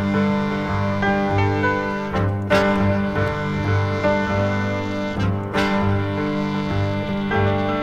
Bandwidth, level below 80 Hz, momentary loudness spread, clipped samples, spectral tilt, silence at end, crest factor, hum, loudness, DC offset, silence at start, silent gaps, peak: 9.4 kHz; -40 dBFS; 4 LU; under 0.1%; -7.5 dB/octave; 0 s; 16 dB; 50 Hz at -30 dBFS; -21 LUFS; under 0.1%; 0 s; none; -4 dBFS